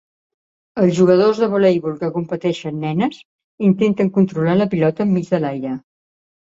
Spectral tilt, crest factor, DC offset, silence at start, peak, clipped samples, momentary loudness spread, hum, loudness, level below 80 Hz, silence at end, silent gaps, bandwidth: -8 dB/octave; 16 dB; under 0.1%; 0.75 s; -2 dBFS; under 0.1%; 10 LU; none; -17 LUFS; -58 dBFS; 0.7 s; 3.25-3.58 s; 7.8 kHz